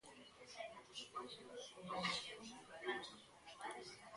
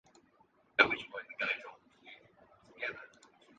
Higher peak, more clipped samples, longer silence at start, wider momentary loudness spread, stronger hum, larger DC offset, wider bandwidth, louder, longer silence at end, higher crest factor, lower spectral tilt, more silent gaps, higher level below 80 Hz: second, -28 dBFS vs -8 dBFS; neither; second, 0.05 s vs 0.8 s; second, 15 LU vs 27 LU; neither; neither; first, 11.5 kHz vs 9 kHz; second, -49 LUFS vs -33 LUFS; second, 0 s vs 0.5 s; second, 22 dB vs 32 dB; about the same, -2.5 dB/octave vs -3.5 dB/octave; neither; second, -82 dBFS vs -74 dBFS